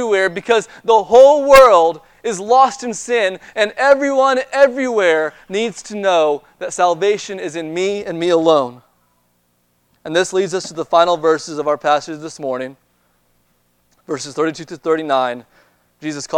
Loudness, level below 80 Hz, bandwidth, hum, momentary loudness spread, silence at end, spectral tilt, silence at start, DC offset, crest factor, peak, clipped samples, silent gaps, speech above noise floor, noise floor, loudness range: -15 LUFS; -50 dBFS; 18.5 kHz; 60 Hz at -55 dBFS; 16 LU; 0 s; -3.5 dB/octave; 0 s; under 0.1%; 16 dB; 0 dBFS; 0.1%; none; 47 dB; -62 dBFS; 11 LU